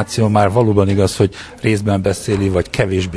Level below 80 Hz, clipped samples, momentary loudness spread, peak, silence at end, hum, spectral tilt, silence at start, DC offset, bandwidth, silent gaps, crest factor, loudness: -38 dBFS; under 0.1%; 5 LU; 0 dBFS; 0 s; none; -6.5 dB/octave; 0 s; 0.1%; 11 kHz; none; 14 dB; -16 LUFS